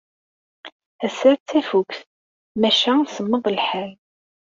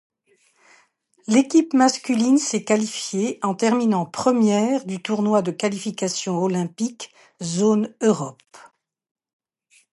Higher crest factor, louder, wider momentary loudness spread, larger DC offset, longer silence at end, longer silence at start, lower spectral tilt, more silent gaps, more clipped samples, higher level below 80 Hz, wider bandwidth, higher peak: about the same, 18 dB vs 18 dB; about the same, -20 LUFS vs -21 LUFS; first, 14 LU vs 9 LU; neither; second, 0.65 s vs 1.35 s; second, 0.65 s vs 1.3 s; about the same, -4.5 dB/octave vs -5 dB/octave; first, 0.72-0.80 s, 0.86-0.99 s, 1.40-1.46 s, 2.06-2.55 s vs none; neither; about the same, -68 dBFS vs -70 dBFS; second, 7.6 kHz vs 11.5 kHz; about the same, -4 dBFS vs -4 dBFS